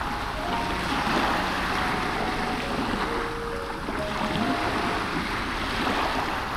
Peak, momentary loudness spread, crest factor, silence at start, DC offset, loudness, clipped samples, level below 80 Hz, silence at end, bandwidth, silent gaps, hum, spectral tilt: -12 dBFS; 5 LU; 16 dB; 0 s; under 0.1%; -27 LUFS; under 0.1%; -40 dBFS; 0 s; 17.5 kHz; none; none; -4.5 dB/octave